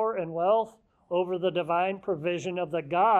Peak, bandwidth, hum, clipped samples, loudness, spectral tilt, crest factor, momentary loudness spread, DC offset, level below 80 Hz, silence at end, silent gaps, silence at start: -12 dBFS; 8.6 kHz; none; under 0.1%; -28 LUFS; -6 dB/octave; 16 dB; 6 LU; under 0.1%; -70 dBFS; 0 s; none; 0 s